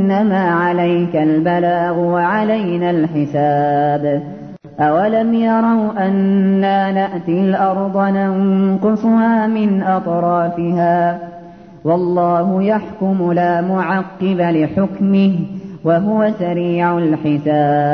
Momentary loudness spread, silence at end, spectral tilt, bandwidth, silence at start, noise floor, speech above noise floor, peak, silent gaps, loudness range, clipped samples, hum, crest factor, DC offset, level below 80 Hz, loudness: 5 LU; 0 s; -10 dB/octave; 5.4 kHz; 0 s; -36 dBFS; 22 dB; -2 dBFS; none; 2 LU; under 0.1%; none; 12 dB; 0.1%; -56 dBFS; -15 LUFS